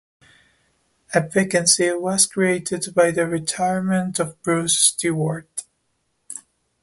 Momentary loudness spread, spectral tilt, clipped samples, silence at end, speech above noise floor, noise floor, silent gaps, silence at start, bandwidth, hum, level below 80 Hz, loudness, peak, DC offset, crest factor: 17 LU; -3.5 dB/octave; under 0.1%; 0.4 s; 50 dB; -70 dBFS; none; 1.1 s; 12 kHz; none; -62 dBFS; -19 LUFS; -2 dBFS; under 0.1%; 20 dB